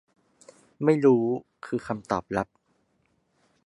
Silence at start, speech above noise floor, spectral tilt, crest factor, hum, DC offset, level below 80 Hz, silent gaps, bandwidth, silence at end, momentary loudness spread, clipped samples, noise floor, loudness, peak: 0.8 s; 46 dB; -8 dB/octave; 20 dB; none; under 0.1%; -62 dBFS; none; 11 kHz; 1.2 s; 13 LU; under 0.1%; -70 dBFS; -26 LUFS; -8 dBFS